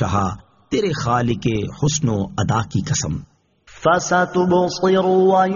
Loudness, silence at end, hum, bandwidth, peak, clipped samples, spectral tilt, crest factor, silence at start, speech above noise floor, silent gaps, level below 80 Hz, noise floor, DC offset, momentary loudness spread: -19 LUFS; 0 s; none; 7.4 kHz; -4 dBFS; under 0.1%; -5.5 dB/octave; 14 dB; 0 s; 30 dB; none; -44 dBFS; -48 dBFS; under 0.1%; 8 LU